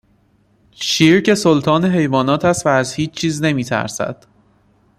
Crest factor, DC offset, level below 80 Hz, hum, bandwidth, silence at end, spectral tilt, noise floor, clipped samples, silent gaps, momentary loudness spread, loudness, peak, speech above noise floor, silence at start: 16 dB; under 0.1%; -52 dBFS; none; 14.5 kHz; 0.85 s; -5 dB/octave; -57 dBFS; under 0.1%; none; 10 LU; -16 LUFS; -2 dBFS; 41 dB; 0.8 s